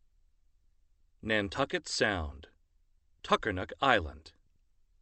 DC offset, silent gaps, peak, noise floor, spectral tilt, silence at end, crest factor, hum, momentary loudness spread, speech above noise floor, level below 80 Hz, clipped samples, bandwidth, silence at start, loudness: under 0.1%; none; -8 dBFS; -68 dBFS; -4 dB/octave; 0.75 s; 26 dB; none; 16 LU; 37 dB; -52 dBFS; under 0.1%; 8.8 kHz; 1.25 s; -31 LUFS